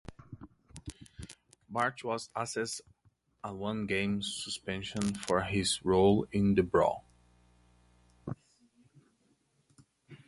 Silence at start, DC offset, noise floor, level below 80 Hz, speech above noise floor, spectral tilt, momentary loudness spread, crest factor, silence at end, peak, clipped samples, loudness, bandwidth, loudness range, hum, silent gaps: 0.1 s; under 0.1%; -72 dBFS; -56 dBFS; 41 dB; -5 dB/octave; 23 LU; 22 dB; 0.1 s; -12 dBFS; under 0.1%; -32 LUFS; 11.5 kHz; 8 LU; none; none